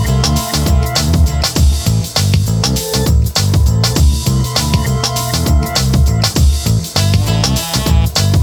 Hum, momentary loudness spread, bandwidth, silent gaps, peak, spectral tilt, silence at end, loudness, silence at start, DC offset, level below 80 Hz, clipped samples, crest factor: none; 2 LU; 20 kHz; none; 0 dBFS; -4.5 dB/octave; 0 s; -13 LUFS; 0 s; under 0.1%; -16 dBFS; under 0.1%; 12 dB